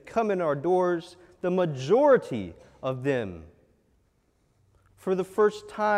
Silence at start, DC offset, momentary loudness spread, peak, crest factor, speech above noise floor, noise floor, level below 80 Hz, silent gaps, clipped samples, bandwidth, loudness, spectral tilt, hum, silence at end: 0.05 s; under 0.1%; 14 LU; -8 dBFS; 18 dB; 43 dB; -68 dBFS; -62 dBFS; none; under 0.1%; 12.5 kHz; -26 LUFS; -7 dB/octave; none; 0 s